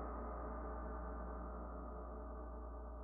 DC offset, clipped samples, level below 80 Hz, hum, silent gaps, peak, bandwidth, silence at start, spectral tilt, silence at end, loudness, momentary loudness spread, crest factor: under 0.1%; under 0.1%; -50 dBFS; 60 Hz at -75 dBFS; none; -34 dBFS; 2.3 kHz; 0 s; -5.5 dB/octave; 0 s; -49 LUFS; 4 LU; 14 dB